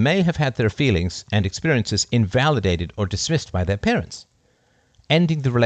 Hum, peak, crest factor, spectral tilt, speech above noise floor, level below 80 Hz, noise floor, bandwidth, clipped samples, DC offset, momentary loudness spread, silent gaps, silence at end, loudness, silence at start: none; -4 dBFS; 16 dB; -5.5 dB/octave; 42 dB; -44 dBFS; -61 dBFS; 9 kHz; under 0.1%; under 0.1%; 6 LU; none; 0 s; -21 LUFS; 0 s